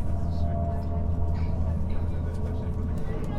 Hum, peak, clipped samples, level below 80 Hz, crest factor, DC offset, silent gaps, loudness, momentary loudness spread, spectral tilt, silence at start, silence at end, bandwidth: none; -14 dBFS; under 0.1%; -32 dBFS; 12 dB; under 0.1%; none; -30 LUFS; 3 LU; -9.5 dB/octave; 0 s; 0 s; 5.6 kHz